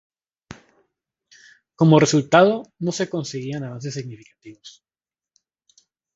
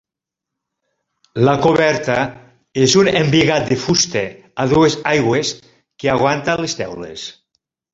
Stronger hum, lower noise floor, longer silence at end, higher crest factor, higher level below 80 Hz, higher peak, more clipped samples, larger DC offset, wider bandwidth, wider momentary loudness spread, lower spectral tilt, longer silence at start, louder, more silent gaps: neither; first, under -90 dBFS vs -84 dBFS; first, 1.45 s vs 0.6 s; about the same, 22 dB vs 18 dB; second, -64 dBFS vs -48 dBFS; about the same, 0 dBFS vs 0 dBFS; neither; neither; about the same, 7.8 kHz vs 8 kHz; first, 24 LU vs 14 LU; about the same, -5.5 dB/octave vs -4.5 dB/octave; first, 1.8 s vs 1.35 s; second, -19 LUFS vs -16 LUFS; neither